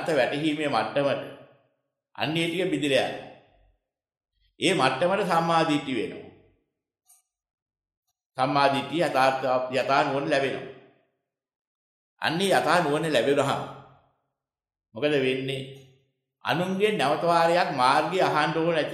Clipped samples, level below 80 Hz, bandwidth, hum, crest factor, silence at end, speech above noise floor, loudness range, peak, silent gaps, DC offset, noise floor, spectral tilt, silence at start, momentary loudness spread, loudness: under 0.1%; -70 dBFS; 14 kHz; none; 20 dB; 0 s; 64 dB; 5 LU; -6 dBFS; 7.54-7.66 s, 7.97-8.03 s, 8.26-8.30 s, 11.56-12.17 s; under 0.1%; -89 dBFS; -5 dB/octave; 0 s; 11 LU; -24 LUFS